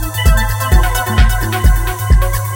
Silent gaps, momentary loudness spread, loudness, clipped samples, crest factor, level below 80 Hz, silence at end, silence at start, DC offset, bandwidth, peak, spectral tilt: none; 1 LU; -14 LUFS; under 0.1%; 12 dB; -12 dBFS; 0 s; 0 s; under 0.1%; 17 kHz; 0 dBFS; -4.5 dB/octave